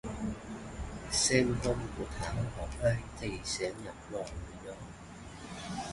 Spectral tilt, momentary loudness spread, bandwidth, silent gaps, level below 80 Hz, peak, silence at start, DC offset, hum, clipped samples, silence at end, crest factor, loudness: -4 dB/octave; 18 LU; 11.5 kHz; none; -46 dBFS; -12 dBFS; 0.05 s; under 0.1%; none; under 0.1%; 0 s; 24 dB; -34 LUFS